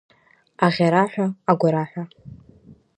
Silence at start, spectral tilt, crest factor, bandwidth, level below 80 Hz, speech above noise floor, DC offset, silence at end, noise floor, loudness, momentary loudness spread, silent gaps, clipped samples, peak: 0.6 s; -7.5 dB/octave; 20 dB; 9.8 kHz; -62 dBFS; 31 dB; under 0.1%; 0.25 s; -51 dBFS; -20 LUFS; 14 LU; none; under 0.1%; -2 dBFS